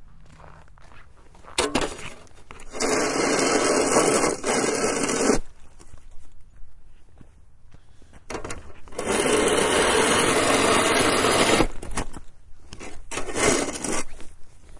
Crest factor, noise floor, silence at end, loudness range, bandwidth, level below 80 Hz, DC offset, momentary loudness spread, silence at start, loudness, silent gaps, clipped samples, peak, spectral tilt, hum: 20 dB; -45 dBFS; 0 s; 10 LU; 11.5 kHz; -40 dBFS; under 0.1%; 19 LU; 0 s; -22 LUFS; none; under 0.1%; -4 dBFS; -2.5 dB/octave; none